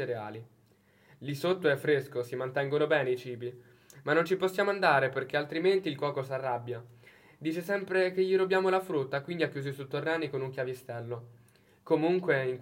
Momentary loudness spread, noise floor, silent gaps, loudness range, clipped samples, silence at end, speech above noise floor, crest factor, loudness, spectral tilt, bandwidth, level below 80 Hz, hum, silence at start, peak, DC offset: 13 LU; -64 dBFS; none; 3 LU; under 0.1%; 0 s; 34 dB; 22 dB; -30 LUFS; -6.5 dB/octave; 16.5 kHz; -78 dBFS; none; 0 s; -10 dBFS; under 0.1%